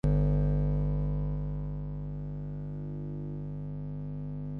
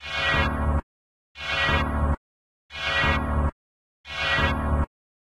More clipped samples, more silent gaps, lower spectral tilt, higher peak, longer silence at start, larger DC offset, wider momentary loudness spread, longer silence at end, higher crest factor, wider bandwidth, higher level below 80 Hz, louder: neither; second, none vs 0.83-1.35 s, 2.17-2.69 s, 3.52-4.04 s; first, -11.5 dB/octave vs -5.5 dB/octave; second, -16 dBFS vs -10 dBFS; about the same, 0.05 s vs 0 s; second, under 0.1% vs 0.3%; about the same, 11 LU vs 11 LU; second, 0 s vs 0.55 s; about the same, 16 dB vs 16 dB; second, 3.1 kHz vs 11 kHz; about the same, -36 dBFS vs -32 dBFS; second, -34 LUFS vs -25 LUFS